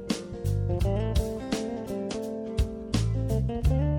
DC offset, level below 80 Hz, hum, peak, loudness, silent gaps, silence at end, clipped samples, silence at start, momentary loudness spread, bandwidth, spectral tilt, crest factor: under 0.1%; -32 dBFS; none; -12 dBFS; -29 LUFS; none; 0 s; under 0.1%; 0 s; 6 LU; 17.5 kHz; -7 dB/octave; 14 dB